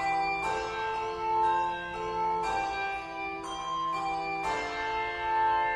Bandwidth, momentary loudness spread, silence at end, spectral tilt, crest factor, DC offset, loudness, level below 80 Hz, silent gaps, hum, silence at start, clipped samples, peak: 11.5 kHz; 7 LU; 0 s; -3.5 dB/octave; 12 dB; under 0.1%; -31 LUFS; -54 dBFS; none; none; 0 s; under 0.1%; -18 dBFS